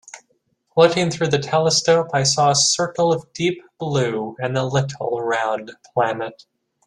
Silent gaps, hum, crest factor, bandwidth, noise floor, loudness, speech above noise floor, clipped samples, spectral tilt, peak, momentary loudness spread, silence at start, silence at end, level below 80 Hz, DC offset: none; none; 18 dB; 12 kHz; -66 dBFS; -19 LUFS; 47 dB; under 0.1%; -3.5 dB/octave; -2 dBFS; 9 LU; 0.15 s; 0.55 s; -58 dBFS; under 0.1%